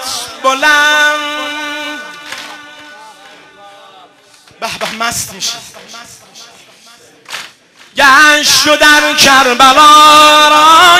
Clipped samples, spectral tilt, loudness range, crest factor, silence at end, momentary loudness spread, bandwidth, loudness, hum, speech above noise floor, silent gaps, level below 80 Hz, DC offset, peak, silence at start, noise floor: 1%; -0.5 dB/octave; 18 LU; 10 dB; 0 s; 22 LU; 17 kHz; -6 LUFS; none; 36 dB; none; -46 dBFS; under 0.1%; 0 dBFS; 0 s; -43 dBFS